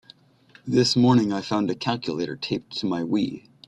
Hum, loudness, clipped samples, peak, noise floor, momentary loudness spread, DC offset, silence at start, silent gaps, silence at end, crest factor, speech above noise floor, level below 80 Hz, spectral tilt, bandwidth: none; -24 LUFS; under 0.1%; -6 dBFS; -55 dBFS; 11 LU; under 0.1%; 0.65 s; none; 0.3 s; 18 dB; 32 dB; -60 dBFS; -5.5 dB/octave; 10.5 kHz